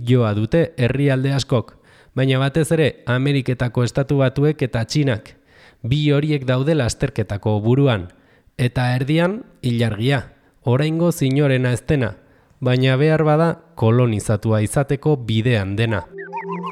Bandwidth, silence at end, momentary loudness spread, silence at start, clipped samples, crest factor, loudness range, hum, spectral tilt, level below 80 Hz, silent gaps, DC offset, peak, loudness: 13.5 kHz; 0 s; 7 LU; 0 s; under 0.1%; 14 dB; 2 LU; none; -7 dB/octave; -44 dBFS; none; under 0.1%; -6 dBFS; -19 LUFS